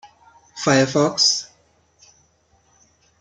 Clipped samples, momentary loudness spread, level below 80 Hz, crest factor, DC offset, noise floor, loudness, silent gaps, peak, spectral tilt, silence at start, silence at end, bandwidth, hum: under 0.1%; 22 LU; -64 dBFS; 22 dB; under 0.1%; -61 dBFS; -18 LUFS; none; -2 dBFS; -3 dB/octave; 0.05 s; 1.75 s; 10 kHz; none